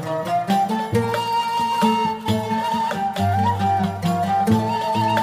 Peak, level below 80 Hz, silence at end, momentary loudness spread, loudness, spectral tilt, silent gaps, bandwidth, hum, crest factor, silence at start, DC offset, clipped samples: -4 dBFS; -54 dBFS; 0 s; 4 LU; -21 LUFS; -6 dB/octave; none; 15.5 kHz; none; 16 dB; 0 s; under 0.1%; under 0.1%